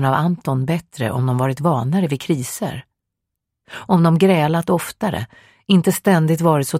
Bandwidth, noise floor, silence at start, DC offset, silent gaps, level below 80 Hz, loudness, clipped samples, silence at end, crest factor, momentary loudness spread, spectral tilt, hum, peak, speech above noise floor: 16 kHz; -80 dBFS; 0 s; under 0.1%; none; -54 dBFS; -18 LUFS; under 0.1%; 0 s; 16 dB; 13 LU; -6.5 dB/octave; none; -2 dBFS; 63 dB